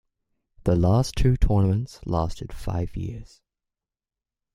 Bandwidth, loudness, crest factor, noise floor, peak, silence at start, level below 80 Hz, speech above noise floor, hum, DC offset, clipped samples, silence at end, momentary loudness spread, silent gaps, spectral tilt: 12.5 kHz; -24 LUFS; 18 dB; -90 dBFS; -8 dBFS; 0.65 s; -32 dBFS; 67 dB; none; under 0.1%; under 0.1%; 1.3 s; 14 LU; none; -7.5 dB/octave